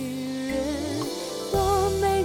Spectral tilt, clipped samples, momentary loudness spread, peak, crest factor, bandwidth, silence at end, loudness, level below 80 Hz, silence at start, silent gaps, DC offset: -5 dB/octave; under 0.1%; 8 LU; -12 dBFS; 14 dB; 17.5 kHz; 0 s; -26 LUFS; -40 dBFS; 0 s; none; under 0.1%